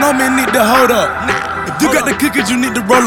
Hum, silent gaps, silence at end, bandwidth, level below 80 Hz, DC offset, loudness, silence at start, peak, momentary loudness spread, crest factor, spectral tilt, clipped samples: none; none; 0 s; 18.5 kHz; -40 dBFS; under 0.1%; -12 LUFS; 0 s; 0 dBFS; 6 LU; 12 dB; -3.5 dB/octave; under 0.1%